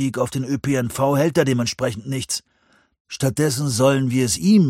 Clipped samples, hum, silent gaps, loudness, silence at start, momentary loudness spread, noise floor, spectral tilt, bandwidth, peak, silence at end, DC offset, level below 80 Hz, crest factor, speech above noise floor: under 0.1%; none; 3.00-3.05 s; -20 LUFS; 0 s; 8 LU; -60 dBFS; -5.5 dB/octave; 16.5 kHz; -4 dBFS; 0 s; under 0.1%; -52 dBFS; 16 dB; 41 dB